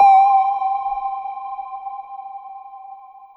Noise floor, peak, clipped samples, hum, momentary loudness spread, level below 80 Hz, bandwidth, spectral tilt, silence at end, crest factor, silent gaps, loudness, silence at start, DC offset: -40 dBFS; -4 dBFS; under 0.1%; none; 24 LU; -62 dBFS; 5.8 kHz; -2.5 dB/octave; 0.1 s; 16 dB; none; -19 LUFS; 0 s; under 0.1%